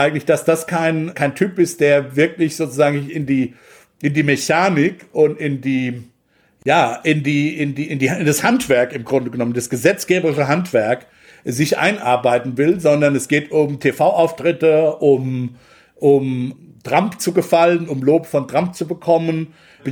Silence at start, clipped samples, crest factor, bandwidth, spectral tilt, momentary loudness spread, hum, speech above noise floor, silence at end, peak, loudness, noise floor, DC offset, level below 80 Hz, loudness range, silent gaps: 0 s; under 0.1%; 16 dB; over 20 kHz; -5.5 dB/octave; 8 LU; none; 42 dB; 0 s; -2 dBFS; -17 LUFS; -58 dBFS; under 0.1%; -60 dBFS; 2 LU; none